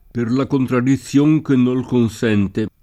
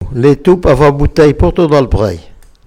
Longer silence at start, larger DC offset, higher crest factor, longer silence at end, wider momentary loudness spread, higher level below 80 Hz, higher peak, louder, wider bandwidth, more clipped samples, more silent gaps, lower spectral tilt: first, 0.15 s vs 0 s; neither; about the same, 12 dB vs 10 dB; second, 0.15 s vs 0.35 s; about the same, 4 LU vs 6 LU; second, -48 dBFS vs -22 dBFS; second, -4 dBFS vs 0 dBFS; second, -17 LUFS vs -10 LUFS; about the same, 13 kHz vs 13.5 kHz; second, under 0.1% vs 0.8%; neither; about the same, -7.5 dB/octave vs -8 dB/octave